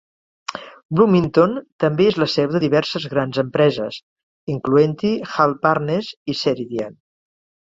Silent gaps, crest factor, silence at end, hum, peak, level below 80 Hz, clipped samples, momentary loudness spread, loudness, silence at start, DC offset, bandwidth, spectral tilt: 0.85-0.89 s, 1.72-1.79 s, 4.03-4.16 s, 4.23-4.47 s, 6.17-6.26 s; 18 dB; 0.75 s; none; -2 dBFS; -56 dBFS; under 0.1%; 16 LU; -19 LUFS; 0.5 s; under 0.1%; 7.8 kHz; -7 dB/octave